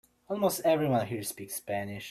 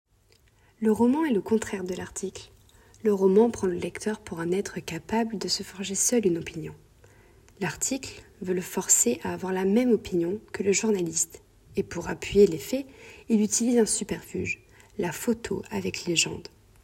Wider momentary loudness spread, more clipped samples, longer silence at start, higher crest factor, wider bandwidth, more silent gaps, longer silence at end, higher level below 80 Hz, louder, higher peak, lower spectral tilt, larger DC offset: second, 10 LU vs 13 LU; neither; second, 0.3 s vs 0.8 s; about the same, 18 dB vs 20 dB; about the same, 16 kHz vs 16 kHz; neither; second, 0 s vs 0.4 s; second, -68 dBFS vs -56 dBFS; second, -31 LUFS vs -26 LUFS; second, -14 dBFS vs -6 dBFS; about the same, -5 dB/octave vs -4 dB/octave; neither